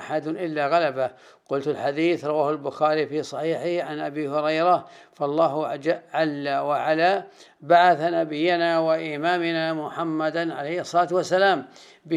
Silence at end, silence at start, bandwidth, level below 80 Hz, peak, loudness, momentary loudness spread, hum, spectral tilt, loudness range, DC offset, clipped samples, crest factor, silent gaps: 0 s; 0 s; 11.5 kHz; -84 dBFS; -6 dBFS; -23 LUFS; 8 LU; none; -5.5 dB/octave; 3 LU; under 0.1%; under 0.1%; 18 dB; none